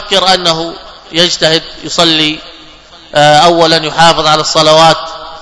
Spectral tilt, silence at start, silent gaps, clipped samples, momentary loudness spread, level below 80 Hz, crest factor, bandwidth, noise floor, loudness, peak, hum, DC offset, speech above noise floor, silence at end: -3 dB/octave; 0 s; none; 3%; 11 LU; -40 dBFS; 10 dB; 11 kHz; -35 dBFS; -8 LUFS; 0 dBFS; none; under 0.1%; 27 dB; 0 s